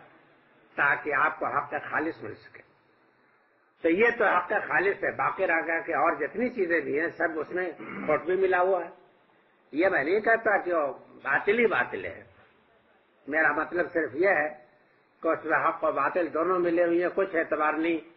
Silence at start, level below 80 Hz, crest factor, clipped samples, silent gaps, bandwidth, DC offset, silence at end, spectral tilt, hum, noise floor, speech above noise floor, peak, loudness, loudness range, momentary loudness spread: 0.75 s; -68 dBFS; 16 dB; under 0.1%; none; 5.8 kHz; under 0.1%; 0.05 s; -8.5 dB/octave; none; -65 dBFS; 39 dB; -10 dBFS; -26 LUFS; 3 LU; 9 LU